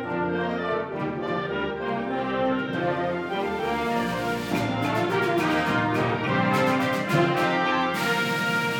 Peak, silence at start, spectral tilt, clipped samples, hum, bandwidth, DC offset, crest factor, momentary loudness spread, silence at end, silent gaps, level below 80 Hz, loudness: -8 dBFS; 0 s; -5.5 dB/octave; under 0.1%; none; 19.5 kHz; under 0.1%; 16 dB; 6 LU; 0 s; none; -54 dBFS; -25 LUFS